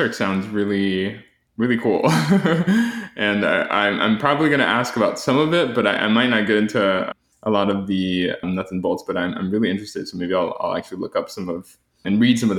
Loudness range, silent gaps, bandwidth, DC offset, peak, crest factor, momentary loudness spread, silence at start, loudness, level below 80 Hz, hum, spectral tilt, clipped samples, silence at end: 6 LU; none; 15 kHz; under 0.1%; -2 dBFS; 18 dB; 10 LU; 0 s; -20 LUFS; -58 dBFS; none; -5.5 dB/octave; under 0.1%; 0 s